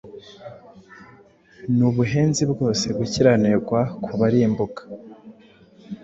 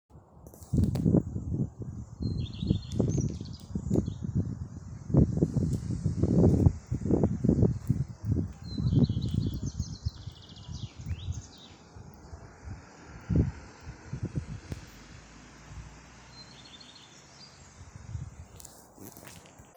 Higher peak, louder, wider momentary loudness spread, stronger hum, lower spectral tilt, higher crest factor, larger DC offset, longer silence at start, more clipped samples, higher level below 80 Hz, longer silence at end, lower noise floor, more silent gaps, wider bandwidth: first, -4 dBFS vs -8 dBFS; first, -20 LUFS vs -30 LUFS; about the same, 22 LU vs 24 LU; neither; second, -6 dB/octave vs -8 dB/octave; second, 18 dB vs 24 dB; neither; about the same, 0.05 s vs 0.15 s; neither; second, -52 dBFS vs -42 dBFS; about the same, 0.05 s vs 0.15 s; about the same, -51 dBFS vs -53 dBFS; neither; second, 8 kHz vs over 20 kHz